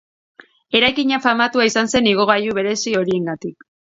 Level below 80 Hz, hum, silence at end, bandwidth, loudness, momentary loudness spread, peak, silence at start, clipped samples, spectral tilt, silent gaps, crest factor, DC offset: -54 dBFS; none; 0.4 s; 7.8 kHz; -17 LUFS; 7 LU; 0 dBFS; 0.7 s; under 0.1%; -3.5 dB/octave; none; 18 dB; under 0.1%